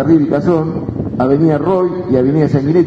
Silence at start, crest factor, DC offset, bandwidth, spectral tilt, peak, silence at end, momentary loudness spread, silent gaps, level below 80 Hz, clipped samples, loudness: 0 s; 12 dB; under 0.1%; 7 kHz; -10 dB/octave; 0 dBFS; 0 s; 7 LU; none; -40 dBFS; under 0.1%; -14 LUFS